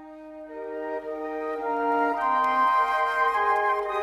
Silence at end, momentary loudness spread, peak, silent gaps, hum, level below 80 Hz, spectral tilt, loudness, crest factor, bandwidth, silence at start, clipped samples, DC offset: 0 s; 15 LU; -12 dBFS; none; none; -62 dBFS; -3.5 dB/octave; -25 LUFS; 14 dB; 12.5 kHz; 0 s; under 0.1%; under 0.1%